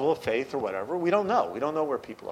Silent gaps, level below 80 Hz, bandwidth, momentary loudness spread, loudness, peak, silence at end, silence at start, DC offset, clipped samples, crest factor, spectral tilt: none; -66 dBFS; 15.5 kHz; 7 LU; -28 LUFS; -10 dBFS; 0 s; 0 s; under 0.1%; under 0.1%; 18 dB; -6 dB/octave